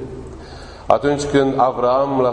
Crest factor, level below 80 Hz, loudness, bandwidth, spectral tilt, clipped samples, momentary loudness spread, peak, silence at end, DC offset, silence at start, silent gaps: 18 dB; -42 dBFS; -17 LUFS; 9.8 kHz; -6 dB/octave; under 0.1%; 20 LU; 0 dBFS; 0 s; under 0.1%; 0 s; none